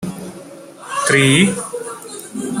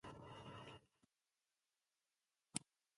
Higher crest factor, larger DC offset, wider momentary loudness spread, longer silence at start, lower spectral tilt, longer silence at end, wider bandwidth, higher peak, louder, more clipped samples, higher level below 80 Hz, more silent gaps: second, 18 dB vs 36 dB; neither; first, 24 LU vs 10 LU; about the same, 0 s vs 0.05 s; about the same, -4 dB/octave vs -3 dB/octave; second, 0 s vs 0.35 s; first, 16 kHz vs 11.5 kHz; first, 0 dBFS vs -24 dBFS; first, -15 LUFS vs -53 LUFS; neither; first, -56 dBFS vs -80 dBFS; neither